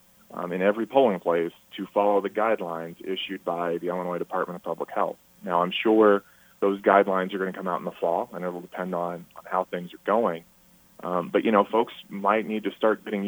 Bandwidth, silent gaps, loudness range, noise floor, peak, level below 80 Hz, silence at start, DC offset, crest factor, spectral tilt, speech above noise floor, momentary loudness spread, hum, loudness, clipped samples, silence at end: over 20 kHz; none; 5 LU; -54 dBFS; -4 dBFS; -72 dBFS; 0.3 s; under 0.1%; 22 dB; -6.5 dB/octave; 29 dB; 13 LU; none; -26 LUFS; under 0.1%; 0 s